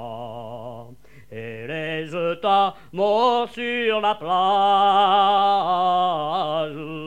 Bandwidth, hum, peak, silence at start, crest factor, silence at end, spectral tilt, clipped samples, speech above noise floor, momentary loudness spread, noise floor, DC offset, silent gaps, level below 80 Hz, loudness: 9.4 kHz; 50 Hz at -60 dBFS; -8 dBFS; 0 s; 14 dB; 0 s; -5.5 dB/octave; under 0.1%; 27 dB; 18 LU; -47 dBFS; 0.5%; none; -60 dBFS; -20 LUFS